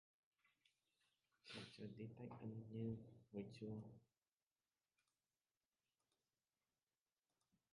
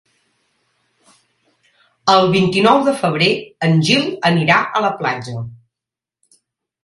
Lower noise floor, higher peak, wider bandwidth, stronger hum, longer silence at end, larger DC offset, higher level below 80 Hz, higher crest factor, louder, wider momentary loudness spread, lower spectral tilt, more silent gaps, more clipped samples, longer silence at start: about the same, under -90 dBFS vs -87 dBFS; second, -38 dBFS vs 0 dBFS; about the same, 11 kHz vs 11.5 kHz; neither; first, 3.7 s vs 1.3 s; neither; second, -84 dBFS vs -58 dBFS; about the same, 22 dB vs 18 dB; second, -55 LUFS vs -15 LUFS; second, 7 LU vs 10 LU; first, -7 dB/octave vs -5.5 dB/octave; neither; neither; second, 1.45 s vs 2.05 s